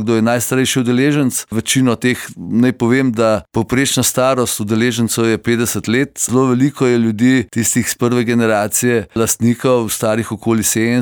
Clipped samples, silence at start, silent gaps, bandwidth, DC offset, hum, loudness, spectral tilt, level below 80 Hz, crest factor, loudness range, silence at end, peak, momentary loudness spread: under 0.1%; 0 s; none; over 20 kHz; under 0.1%; none; -15 LUFS; -4.5 dB/octave; -48 dBFS; 12 dB; 1 LU; 0 s; -2 dBFS; 4 LU